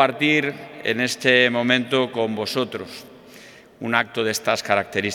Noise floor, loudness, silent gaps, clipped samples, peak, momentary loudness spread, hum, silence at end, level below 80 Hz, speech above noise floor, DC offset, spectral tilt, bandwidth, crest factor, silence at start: -45 dBFS; -20 LUFS; none; under 0.1%; 0 dBFS; 12 LU; none; 0 s; -68 dBFS; 24 dB; under 0.1%; -3.5 dB/octave; 18.5 kHz; 22 dB; 0 s